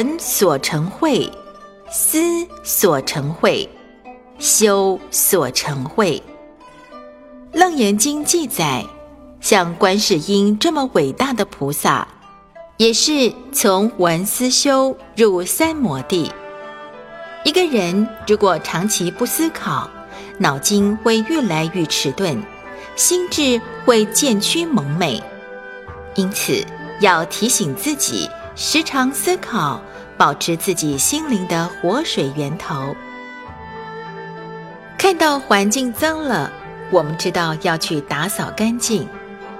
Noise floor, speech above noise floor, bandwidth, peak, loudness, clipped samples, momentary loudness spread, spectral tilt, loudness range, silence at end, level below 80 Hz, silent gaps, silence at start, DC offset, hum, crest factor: -42 dBFS; 25 dB; 16.5 kHz; 0 dBFS; -17 LUFS; under 0.1%; 17 LU; -3.5 dB/octave; 3 LU; 0 s; -50 dBFS; none; 0 s; under 0.1%; none; 18 dB